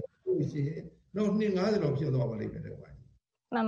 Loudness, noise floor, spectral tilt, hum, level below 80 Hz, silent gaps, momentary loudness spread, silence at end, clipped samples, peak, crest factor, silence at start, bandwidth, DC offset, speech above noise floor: -31 LUFS; -62 dBFS; -8.5 dB/octave; none; -60 dBFS; none; 15 LU; 0 s; under 0.1%; -16 dBFS; 16 dB; 0 s; 7.4 kHz; under 0.1%; 32 dB